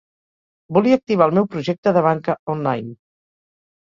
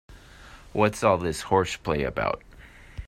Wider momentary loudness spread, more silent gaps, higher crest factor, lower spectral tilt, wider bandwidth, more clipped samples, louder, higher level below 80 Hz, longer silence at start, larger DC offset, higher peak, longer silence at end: second, 7 LU vs 11 LU; first, 1.78-1.83 s, 2.39-2.47 s vs none; about the same, 18 dB vs 22 dB; first, -8 dB/octave vs -5.5 dB/octave; second, 7.4 kHz vs 16 kHz; neither; first, -19 LUFS vs -26 LUFS; second, -60 dBFS vs -46 dBFS; first, 0.7 s vs 0.1 s; neither; first, -2 dBFS vs -6 dBFS; first, 0.85 s vs 0 s